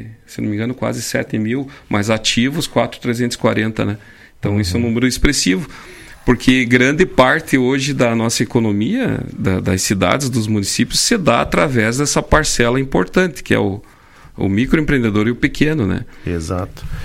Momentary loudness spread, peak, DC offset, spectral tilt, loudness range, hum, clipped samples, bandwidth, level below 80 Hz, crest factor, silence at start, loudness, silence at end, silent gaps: 10 LU; 0 dBFS; under 0.1%; -4.5 dB/octave; 4 LU; none; under 0.1%; 16.5 kHz; -32 dBFS; 16 dB; 0 s; -16 LUFS; 0 s; none